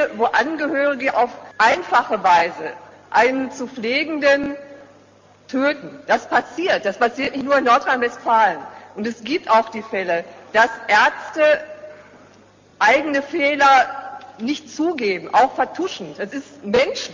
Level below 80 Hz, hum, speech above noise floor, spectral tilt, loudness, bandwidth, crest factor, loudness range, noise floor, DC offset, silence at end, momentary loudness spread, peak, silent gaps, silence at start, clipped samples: -60 dBFS; none; 32 dB; -3.5 dB/octave; -19 LUFS; 7.6 kHz; 16 dB; 3 LU; -50 dBFS; under 0.1%; 0 s; 13 LU; -4 dBFS; none; 0 s; under 0.1%